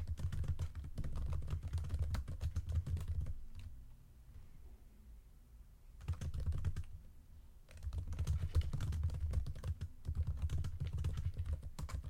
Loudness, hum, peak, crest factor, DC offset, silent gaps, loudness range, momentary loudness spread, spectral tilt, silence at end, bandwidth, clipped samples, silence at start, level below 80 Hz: -43 LUFS; none; -24 dBFS; 16 dB; under 0.1%; none; 7 LU; 21 LU; -7 dB/octave; 0 s; 13 kHz; under 0.1%; 0 s; -44 dBFS